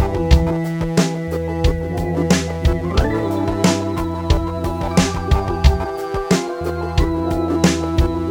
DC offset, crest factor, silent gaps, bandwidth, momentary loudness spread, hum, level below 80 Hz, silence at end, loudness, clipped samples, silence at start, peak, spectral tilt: under 0.1%; 18 dB; none; 18.5 kHz; 7 LU; none; -24 dBFS; 0 s; -19 LUFS; under 0.1%; 0 s; 0 dBFS; -6 dB/octave